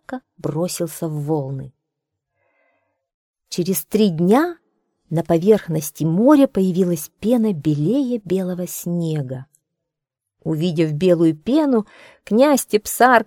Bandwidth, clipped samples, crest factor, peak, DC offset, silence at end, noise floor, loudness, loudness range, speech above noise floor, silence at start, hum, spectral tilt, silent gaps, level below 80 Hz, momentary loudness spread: 19 kHz; under 0.1%; 20 dB; 0 dBFS; under 0.1%; 0.05 s; -82 dBFS; -19 LUFS; 8 LU; 64 dB; 0.1 s; none; -6 dB/octave; 3.14-3.34 s; -56 dBFS; 11 LU